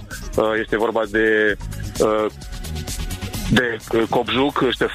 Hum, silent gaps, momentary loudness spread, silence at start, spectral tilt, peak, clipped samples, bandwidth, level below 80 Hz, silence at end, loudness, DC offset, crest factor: none; none; 10 LU; 0 s; -5 dB/octave; -2 dBFS; under 0.1%; 15.5 kHz; -34 dBFS; 0 s; -20 LUFS; under 0.1%; 18 dB